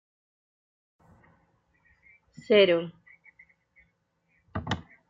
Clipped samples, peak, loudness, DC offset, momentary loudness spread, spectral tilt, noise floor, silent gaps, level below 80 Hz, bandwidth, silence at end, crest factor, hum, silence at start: under 0.1%; -10 dBFS; -25 LUFS; under 0.1%; 19 LU; -6 dB/octave; -73 dBFS; none; -62 dBFS; 7.6 kHz; 0.3 s; 22 dB; none; 2.5 s